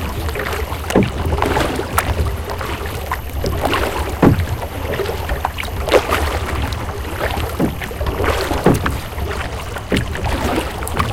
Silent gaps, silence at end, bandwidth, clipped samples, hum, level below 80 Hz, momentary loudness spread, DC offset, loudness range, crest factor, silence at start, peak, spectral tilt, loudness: none; 0 s; 17 kHz; under 0.1%; none; -26 dBFS; 9 LU; under 0.1%; 2 LU; 18 dB; 0 s; 0 dBFS; -5.5 dB/octave; -19 LUFS